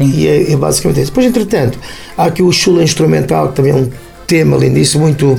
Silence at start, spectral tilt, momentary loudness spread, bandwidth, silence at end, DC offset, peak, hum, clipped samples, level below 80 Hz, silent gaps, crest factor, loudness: 0 s; -5.5 dB/octave; 6 LU; 17 kHz; 0 s; under 0.1%; 0 dBFS; none; under 0.1%; -34 dBFS; none; 10 dB; -11 LUFS